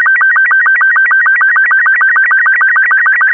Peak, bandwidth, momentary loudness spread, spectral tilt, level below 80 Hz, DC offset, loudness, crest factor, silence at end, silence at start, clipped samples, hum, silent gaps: -2 dBFS; 3.4 kHz; 0 LU; -2.5 dB/octave; under -90 dBFS; under 0.1%; -6 LUFS; 6 dB; 0 s; 0 s; under 0.1%; none; none